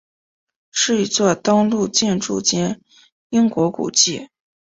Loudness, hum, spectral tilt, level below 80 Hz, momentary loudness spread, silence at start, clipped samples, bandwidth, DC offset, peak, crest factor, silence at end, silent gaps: -18 LUFS; none; -3.5 dB/octave; -58 dBFS; 8 LU; 0.75 s; under 0.1%; 8 kHz; under 0.1%; 0 dBFS; 20 dB; 0.45 s; 3.12-3.30 s